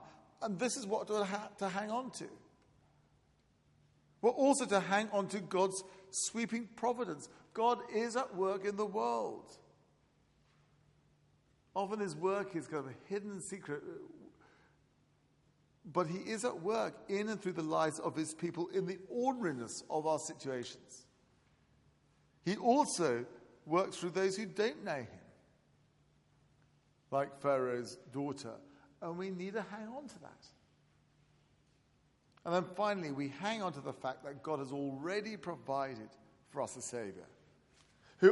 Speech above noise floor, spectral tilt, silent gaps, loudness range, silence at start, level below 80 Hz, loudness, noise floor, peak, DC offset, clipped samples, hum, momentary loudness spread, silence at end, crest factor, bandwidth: 35 dB; -4.5 dB/octave; none; 9 LU; 0 s; -80 dBFS; -37 LUFS; -72 dBFS; -12 dBFS; under 0.1%; under 0.1%; none; 14 LU; 0 s; 26 dB; 11.5 kHz